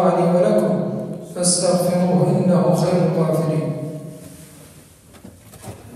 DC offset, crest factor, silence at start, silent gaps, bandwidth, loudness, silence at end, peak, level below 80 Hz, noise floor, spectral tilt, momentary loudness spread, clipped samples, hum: under 0.1%; 16 dB; 0 s; none; 14.5 kHz; -18 LUFS; 0 s; -4 dBFS; -58 dBFS; -45 dBFS; -6 dB/octave; 21 LU; under 0.1%; none